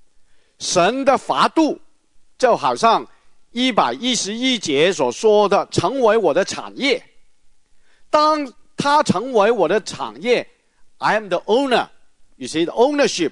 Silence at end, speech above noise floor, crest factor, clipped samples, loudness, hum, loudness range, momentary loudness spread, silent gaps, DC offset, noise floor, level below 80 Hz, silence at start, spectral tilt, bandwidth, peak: 0 s; 31 dB; 18 dB; under 0.1%; -18 LUFS; none; 3 LU; 8 LU; none; under 0.1%; -49 dBFS; -60 dBFS; 0.6 s; -3.5 dB/octave; 11 kHz; 0 dBFS